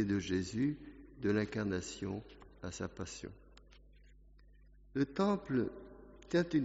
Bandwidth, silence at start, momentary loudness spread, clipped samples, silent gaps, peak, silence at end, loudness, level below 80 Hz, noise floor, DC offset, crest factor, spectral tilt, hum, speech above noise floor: 8 kHz; 0 s; 18 LU; under 0.1%; none; -20 dBFS; 0 s; -37 LUFS; -60 dBFS; -61 dBFS; under 0.1%; 18 dB; -6 dB/octave; none; 25 dB